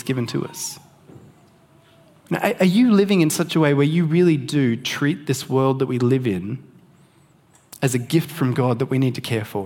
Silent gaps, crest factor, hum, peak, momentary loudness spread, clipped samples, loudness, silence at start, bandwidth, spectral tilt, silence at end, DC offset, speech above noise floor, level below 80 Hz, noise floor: none; 18 dB; none; -2 dBFS; 11 LU; under 0.1%; -20 LUFS; 0.05 s; 17.5 kHz; -6 dB/octave; 0 s; under 0.1%; 36 dB; -64 dBFS; -55 dBFS